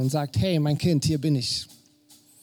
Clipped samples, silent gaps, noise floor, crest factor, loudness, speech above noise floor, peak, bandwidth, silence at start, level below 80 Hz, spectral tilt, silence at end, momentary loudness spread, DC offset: under 0.1%; none; -57 dBFS; 14 dB; -24 LUFS; 33 dB; -12 dBFS; 19.5 kHz; 0 s; -52 dBFS; -6 dB/octave; 0.75 s; 6 LU; under 0.1%